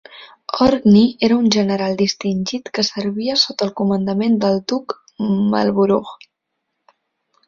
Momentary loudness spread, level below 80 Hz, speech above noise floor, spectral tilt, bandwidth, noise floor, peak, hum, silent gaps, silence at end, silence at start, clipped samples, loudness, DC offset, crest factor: 11 LU; -52 dBFS; 59 dB; -5.5 dB/octave; 7.4 kHz; -76 dBFS; -2 dBFS; none; none; 1.35 s; 0.15 s; under 0.1%; -17 LUFS; under 0.1%; 16 dB